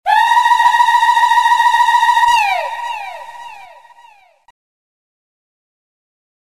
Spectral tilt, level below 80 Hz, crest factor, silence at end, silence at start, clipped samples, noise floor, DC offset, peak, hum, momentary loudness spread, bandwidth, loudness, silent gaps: 2 dB/octave; -60 dBFS; 14 dB; 2.9 s; 0.05 s; under 0.1%; -46 dBFS; 0.5%; 0 dBFS; none; 17 LU; 14 kHz; -11 LUFS; none